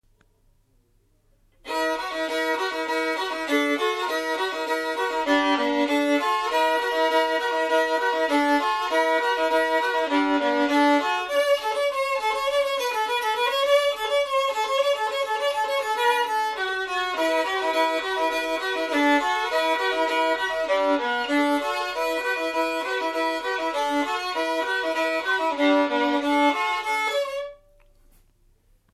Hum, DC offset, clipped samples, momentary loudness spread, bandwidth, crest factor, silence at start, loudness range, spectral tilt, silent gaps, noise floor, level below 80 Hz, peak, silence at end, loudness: none; under 0.1%; under 0.1%; 5 LU; 15 kHz; 16 dB; 1.65 s; 3 LU; -1.5 dB/octave; none; -63 dBFS; -62 dBFS; -8 dBFS; 1.4 s; -23 LUFS